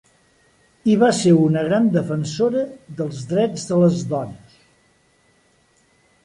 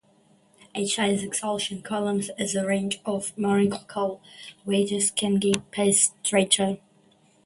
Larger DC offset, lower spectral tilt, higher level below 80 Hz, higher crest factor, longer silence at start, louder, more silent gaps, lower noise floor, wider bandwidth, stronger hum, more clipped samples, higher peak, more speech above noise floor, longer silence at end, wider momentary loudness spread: neither; first, -6.5 dB/octave vs -3.5 dB/octave; about the same, -60 dBFS vs -64 dBFS; second, 16 dB vs 22 dB; about the same, 0.85 s vs 0.75 s; first, -19 LUFS vs -24 LUFS; neither; about the same, -59 dBFS vs -61 dBFS; about the same, 11 kHz vs 11.5 kHz; neither; neither; about the same, -4 dBFS vs -4 dBFS; first, 41 dB vs 35 dB; first, 1.9 s vs 0.7 s; first, 13 LU vs 10 LU